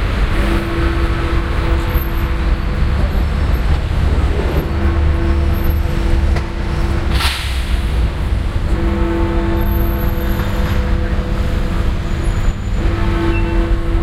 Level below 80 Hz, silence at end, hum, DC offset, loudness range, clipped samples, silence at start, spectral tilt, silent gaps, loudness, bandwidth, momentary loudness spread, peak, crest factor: -16 dBFS; 0 s; none; under 0.1%; 2 LU; under 0.1%; 0 s; -6.5 dB/octave; none; -18 LUFS; 14.5 kHz; 3 LU; 0 dBFS; 14 dB